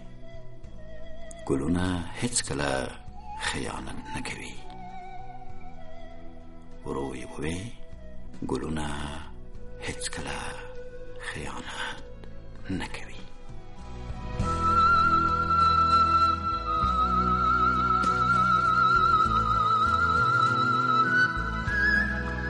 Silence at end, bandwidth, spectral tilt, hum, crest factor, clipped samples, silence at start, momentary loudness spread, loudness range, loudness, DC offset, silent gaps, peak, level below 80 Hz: 0 s; 11.5 kHz; -4.5 dB/octave; none; 16 dB; under 0.1%; 0 s; 24 LU; 16 LU; -25 LUFS; under 0.1%; none; -10 dBFS; -40 dBFS